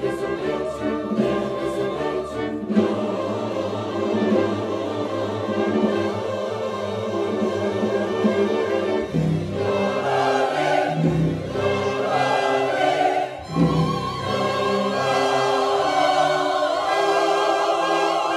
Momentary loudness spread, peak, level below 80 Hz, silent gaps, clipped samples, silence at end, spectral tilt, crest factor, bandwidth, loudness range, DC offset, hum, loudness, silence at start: 6 LU; -6 dBFS; -50 dBFS; none; under 0.1%; 0 s; -6 dB/octave; 16 dB; 14 kHz; 4 LU; under 0.1%; none; -22 LUFS; 0 s